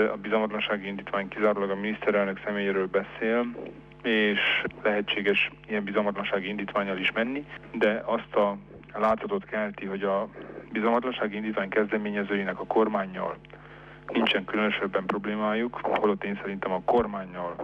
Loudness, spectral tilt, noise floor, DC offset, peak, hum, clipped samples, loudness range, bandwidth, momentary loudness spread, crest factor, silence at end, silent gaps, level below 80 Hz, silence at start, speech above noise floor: -27 LUFS; -7 dB/octave; -47 dBFS; under 0.1%; -12 dBFS; 50 Hz at -55 dBFS; under 0.1%; 2 LU; 6.6 kHz; 9 LU; 16 dB; 0 s; none; -58 dBFS; 0 s; 20 dB